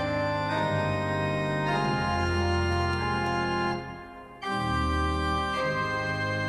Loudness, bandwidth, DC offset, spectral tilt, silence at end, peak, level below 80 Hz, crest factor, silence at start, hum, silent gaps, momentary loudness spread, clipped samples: -28 LUFS; 12 kHz; under 0.1%; -6 dB/octave; 0 s; -14 dBFS; -40 dBFS; 12 dB; 0 s; none; none; 5 LU; under 0.1%